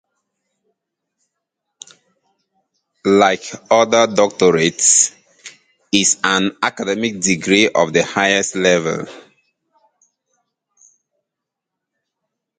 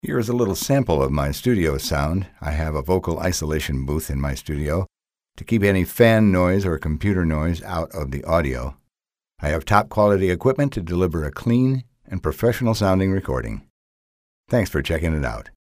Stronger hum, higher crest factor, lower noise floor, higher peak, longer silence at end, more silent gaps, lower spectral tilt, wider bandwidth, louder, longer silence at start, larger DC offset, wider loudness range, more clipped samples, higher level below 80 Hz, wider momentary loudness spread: neither; about the same, 18 dB vs 20 dB; second, -82 dBFS vs under -90 dBFS; about the same, 0 dBFS vs 0 dBFS; first, 3.4 s vs 0.2 s; second, none vs 13.70-14.44 s; second, -2.5 dB/octave vs -6.5 dB/octave; second, 9.6 kHz vs 16 kHz; first, -15 LUFS vs -21 LUFS; first, 3.05 s vs 0.05 s; neither; first, 7 LU vs 4 LU; neither; second, -58 dBFS vs -34 dBFS; about the same, 8 LU vs 10 LU